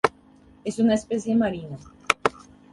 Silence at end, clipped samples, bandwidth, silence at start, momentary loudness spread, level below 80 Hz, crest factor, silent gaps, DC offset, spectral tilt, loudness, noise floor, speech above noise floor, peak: 0.4 s; under 0.1%; 11.5 kHz; 0.05 s; 13 LU; -56 dBFS; 26 dB; none; under 0.1%; -5 dB/octave; -25 LUFS; -53 dBFS; 29 dB; 0 dBFS